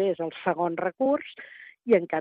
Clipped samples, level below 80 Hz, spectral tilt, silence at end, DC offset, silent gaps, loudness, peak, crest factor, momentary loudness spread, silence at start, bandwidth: under 0.1%; -74 dBFS; -9 dB/octave; 0 s; under 0.1%; none; -27 LUFS; -8 dBFS; 18 dB; 18 LU; 0 s; 4.8 kHz